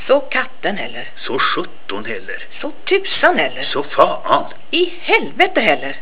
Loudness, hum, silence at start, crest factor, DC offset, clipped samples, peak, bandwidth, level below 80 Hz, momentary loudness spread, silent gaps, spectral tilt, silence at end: -17 LUFS; none; 0 s; 18 dB; 7%; under 0.1%; 0 dBFS; 4 kHz; -62 dBFS; 13 LU; none; -7 dB/octave; 0 s